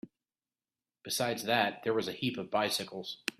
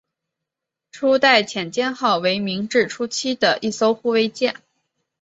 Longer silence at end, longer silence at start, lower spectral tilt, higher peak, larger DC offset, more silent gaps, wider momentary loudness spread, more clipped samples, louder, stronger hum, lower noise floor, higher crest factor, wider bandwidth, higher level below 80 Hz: second, 0.1 s vs 0.7 s; second, 0.05 s vs 0.95 s; about the same, -3 dB/octave vs -3.5 dB/octave; second, -10 dBFS vs -2 dBFS; neither; neither; about the same, 8 LU vs 9 LU; neither; second, -33 LUFS vs -19 LUFS; neither; first, under -90 dBFS vs -84 dBFS; about the same, 24 dB vs 20 dB; first, 15.5 kHz vs 8 kHz; second, -74 dBFS vs -66 dBFS